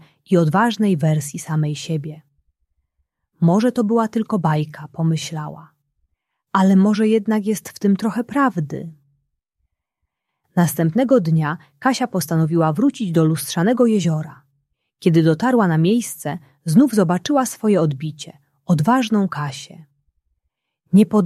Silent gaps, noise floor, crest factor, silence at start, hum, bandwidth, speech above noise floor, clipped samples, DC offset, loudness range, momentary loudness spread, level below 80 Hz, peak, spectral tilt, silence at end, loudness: none; -78 dBFS; 16 dB; 0.3 s; none; 15 kHz; 60 dB; under 0.1%; under 0.1%; 4 LU; 13 LU; -62 dBFS; -2 dBFS; -6.5 dB/octave; 0 s; -18 LUFS